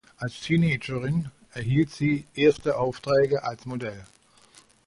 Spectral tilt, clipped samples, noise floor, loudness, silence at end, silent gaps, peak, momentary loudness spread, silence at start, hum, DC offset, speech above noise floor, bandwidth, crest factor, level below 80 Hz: -7 dB/octave; under 0.1%; -56 dBFS; -26 LUFS; 0.8 s; none; -8 dBFS; 12 LU; 0.2 s; none; under 0.1%; 31 dB; 11.5 kHz; 18 dB; -54 dBFS